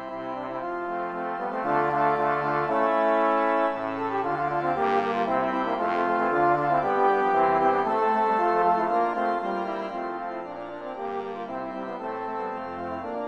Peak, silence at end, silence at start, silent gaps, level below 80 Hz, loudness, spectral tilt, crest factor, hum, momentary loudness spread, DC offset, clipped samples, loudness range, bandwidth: -10 dBFS; 0 s; 0 s; none; -62 dBFS; -25 LUFS; -7 dB/octave; 16 dB; none; 11 LU; under 0.1%; under 0.1%; 8 LU; 8.4 kHz